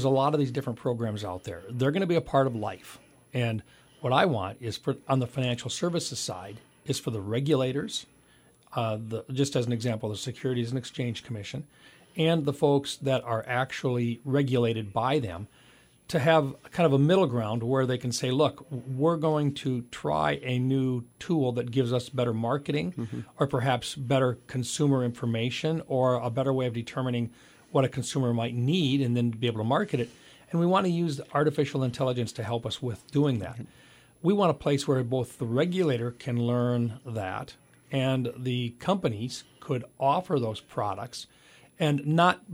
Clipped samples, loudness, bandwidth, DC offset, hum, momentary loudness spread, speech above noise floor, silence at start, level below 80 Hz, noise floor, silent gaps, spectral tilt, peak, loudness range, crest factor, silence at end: under 0.1%; -28 LUFS; 15.5 kHz; under 0.1%; none; 11 LU; 32 dB; 0 s; -62 dBFS; -60 dBFS; none; -6 dB/octave; -8 dBFS; 4 LU; 20 dB; 0 s